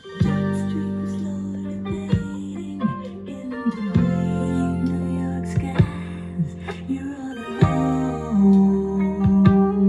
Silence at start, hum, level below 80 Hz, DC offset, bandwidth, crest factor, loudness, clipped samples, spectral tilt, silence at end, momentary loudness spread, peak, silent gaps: 0.05 s; none; -42 dBFS; under 0.1%; 10.5 kHz; 20 dB; -22 LUFS; under 0.1%; -8.5 dB/octave; 0 s; 14 LU; -2 dBFS; none